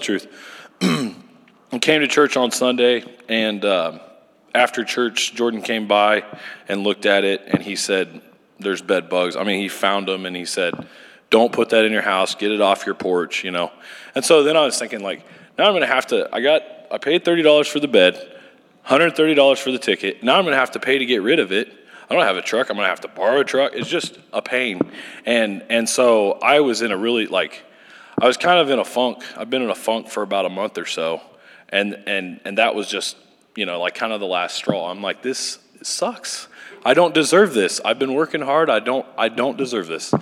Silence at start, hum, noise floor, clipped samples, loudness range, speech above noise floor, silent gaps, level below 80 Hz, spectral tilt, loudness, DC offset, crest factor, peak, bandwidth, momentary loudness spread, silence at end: 0 s; none; -50 dBFS; under 0.1%; 5 LU; 31 dB; none; -74 dBFS; -3.5 dB/octave; -19 LUFS; under 0.1%; 18 dB; 0 dBFS; 15.5 kHz; 11 LU; 0 s